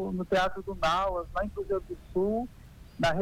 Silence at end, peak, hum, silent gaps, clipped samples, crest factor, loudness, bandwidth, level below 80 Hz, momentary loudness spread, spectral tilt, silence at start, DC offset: 0 s; -16 dBFS; none; none; under 0.1%; 14 dB; -30 LUFS; 18 kHz; -46 dBFS; 7 LU; -5.5 dB/octave; 0 s; under 0.1%